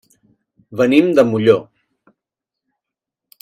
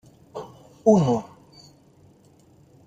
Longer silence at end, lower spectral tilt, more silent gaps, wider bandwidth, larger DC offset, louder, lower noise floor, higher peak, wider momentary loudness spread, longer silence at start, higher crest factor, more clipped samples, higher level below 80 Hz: first, 1.8 s vs 1.65 s; about the same, -7 dB/octave vs -8 dB/octave; neither; first, 14.5 kHz vs 9 kHz; neither; first, -14 LUFS vs -21 LUFS; first, -84 dBFS vs -55 dBFS; first, 0 dBFS vs -4 dBFS; second, 6 LU vs 25 LU; first, 0.7 s vs 0.35 s; about the same, 18 dB vs 22 dB; neither; about the same, -60 dBFS vs -62 dBFS